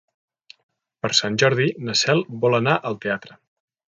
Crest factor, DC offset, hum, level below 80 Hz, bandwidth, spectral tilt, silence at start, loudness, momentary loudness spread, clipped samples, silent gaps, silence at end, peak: 20 dB; under 0.1%; none; -64 dBFS; 9.6 kHz; -4 dB/octave; 1.05 s; -20 LUFS; 9 LU; under 0.1%; none; 0.65 s; -2 dBFS